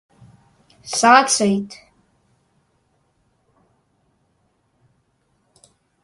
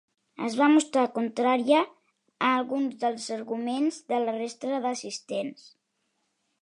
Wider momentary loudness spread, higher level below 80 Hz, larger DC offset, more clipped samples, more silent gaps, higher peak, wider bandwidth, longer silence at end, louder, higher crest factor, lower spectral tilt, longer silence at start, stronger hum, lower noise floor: first, 28 LU vs 12 LU; first, -66 dBFS vs -84 dBFS; neither; neither; neither; first, 0 dBFS vs -8 dBFS; about the same, 11.5 kHz vs 11 kHz; first, 4.3 s vs 1.1 s; first, -15 LUFS vs -27 LUFS; about the same, 24 dB vs 20 dB; about the same, -2.5 dB/octave vs -3.5 dB/octave; first, 0.85 s vs 0.4 s; neither; second, -66 dBFS vs -76 dBFS